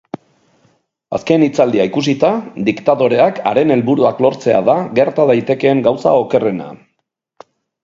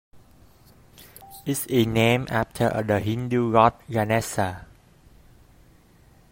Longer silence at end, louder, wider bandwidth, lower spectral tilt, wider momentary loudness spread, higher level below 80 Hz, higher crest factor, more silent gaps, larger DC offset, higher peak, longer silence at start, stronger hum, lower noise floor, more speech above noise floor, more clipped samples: second, 1.1 s vs 1.65 s; first, -14 LUFS vs -23 LUFS; second, 7.6 kHz vs 16.5 kHz; first, -7 dB/octave vs -5.5 dB/octave; about the same, 8 LU vs 10 LU; about the same, -56 dBFS vs -52 dBFS; second, 14 dB vs 22 dB; neither; neither; about the same, 0 dBFS vs -2 dBFS; about the same, 0.15 s vs 0.15 s; neither; first, -71 dBFS vs -55 dBFS; first, 58 dB vs 32 dB; neither